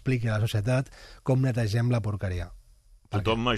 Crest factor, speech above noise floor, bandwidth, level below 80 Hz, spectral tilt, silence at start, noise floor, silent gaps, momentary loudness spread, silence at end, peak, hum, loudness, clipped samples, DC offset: 16 dB; 30 dB; 13.5 kHz; -46 dBFS; -7 dB/octave; 0.05 s; -56 dBFS; none; 10 LU; 0 s; -12 dBFS; none; -28 LUFS; under 0.1%; under 0.1%